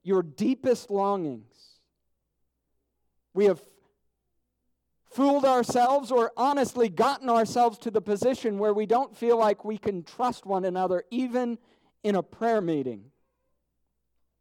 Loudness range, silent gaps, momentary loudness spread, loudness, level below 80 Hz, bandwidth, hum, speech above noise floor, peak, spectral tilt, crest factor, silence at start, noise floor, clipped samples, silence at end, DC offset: 8 LU; none; 10 LU; -26 LUFS; -70 dBFS; 16 kHz; none; 52 dB; -12 dBFS; -5.5 dB/octave; 14 dB; 0.05 s; -78 dBFS; under 0.1%; 1.4 s; under 0.1%